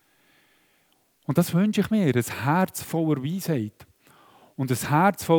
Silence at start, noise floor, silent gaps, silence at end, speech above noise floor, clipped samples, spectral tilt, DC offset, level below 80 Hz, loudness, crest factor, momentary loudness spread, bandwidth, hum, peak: 1.3 s; -66 dBFS; none; 0 s; 43 dB; under 0.1%; -6 dB/octave; under 0.1%; -62 dBFS; -24 LUFS; 20 dB; 10 LU; over 20 kHz; none; -6 dBFS